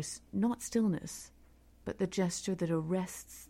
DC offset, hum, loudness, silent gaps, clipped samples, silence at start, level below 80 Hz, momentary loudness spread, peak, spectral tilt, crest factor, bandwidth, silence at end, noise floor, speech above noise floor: under 0.1%; none; -35 LUFS; none; under 0.1%; 0 s; -62 dBFS; 13 LU; -20 dBFS; -5.5 dB/octave; 16 dB; 16.5 kHz; 0.05 s; -61 dBFS; 26 dB